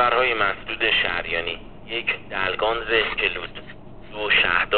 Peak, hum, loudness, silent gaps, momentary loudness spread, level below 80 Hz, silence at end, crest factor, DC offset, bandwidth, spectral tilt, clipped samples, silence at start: -4 dBFS; none; -22 LUFS; none; 13 LU; -44 dBFS; 0 s; 20 dB; 0.8%; 4.7 kHz; 0.5 dB/octave; under 0.1%; 0 s